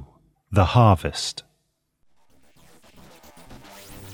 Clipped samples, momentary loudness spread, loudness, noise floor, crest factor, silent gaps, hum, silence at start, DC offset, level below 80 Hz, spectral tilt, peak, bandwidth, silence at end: under 0.1%; 26 LU; -20 LUFS; -72 dBFS; 22 dB; none; none; 0 s; under 0.1%; -42 dBFS; -6 dB/octave; -4 dBFS; 19.5 kHz; 0 s